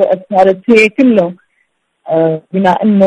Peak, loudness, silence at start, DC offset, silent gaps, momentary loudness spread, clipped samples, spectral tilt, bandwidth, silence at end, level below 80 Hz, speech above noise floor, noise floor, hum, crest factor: 0 dBFS; -11 LUFS; 0 s; under 0.1%; none; 6 LU; 0.3%; -7 dB/octave; 10.5 kHz; 0 s; -54 dBFS; 52 dB; -62 dBFS; none; 10 dB